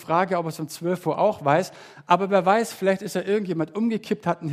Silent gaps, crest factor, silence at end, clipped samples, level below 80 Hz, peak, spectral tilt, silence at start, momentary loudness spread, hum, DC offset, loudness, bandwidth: none; 20 dB; 0 s; under 0.1%; -70 dBFS; -2 dBFS; -6 dB/octave; 0 s; 8 LU; none; under 0.1%; -23 LUFS; 15.5 kHz